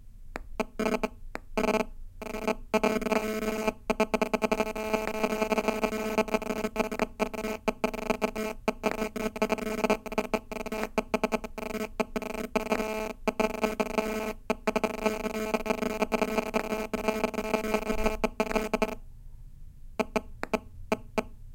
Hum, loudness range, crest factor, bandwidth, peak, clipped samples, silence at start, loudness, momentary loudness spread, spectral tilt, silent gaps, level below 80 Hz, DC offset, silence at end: none; 3 LU; 22 dB; 17 kHz; -10 dBFS; under 0.1%; 0 s; -31 LUFS; 7 LU; -4.5 dB/octave; none; -44 dBFS; under 0.1%; 0 s